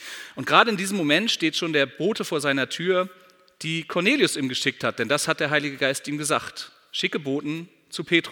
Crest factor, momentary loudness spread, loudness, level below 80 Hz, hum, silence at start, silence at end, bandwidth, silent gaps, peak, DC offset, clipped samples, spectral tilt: 24 dB; 13 LU; -23 LUFS; -72 dBFS; none; 0 s; 0 s; 19 kHz; none; 0 dBFS; under 0.1%; under 0.1%; -3.5 dB/octave